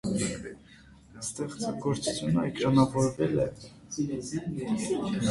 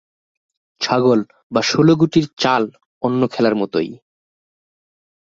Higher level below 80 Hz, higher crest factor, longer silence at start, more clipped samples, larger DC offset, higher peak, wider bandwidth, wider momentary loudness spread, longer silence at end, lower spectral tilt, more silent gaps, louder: about the same, -54 dBFS vs -56 dBFS; about the same, 20 dB vs 18 dB; second, 0.05 s vs 0.8 s; neither; neither; second, -8 dBFS vs -2 dBFS; first, 11.5 kHz vs 7.8 kHz; first, 14 LU vs 11 LU; second, 0 s vs 1.35 s; about the same, -5.5 dB/octave vs -6 dB/octave; second, none vs 1.43-1.50 s, 2.86-3.01 s; second, -30 LUFS vs -17 LUFS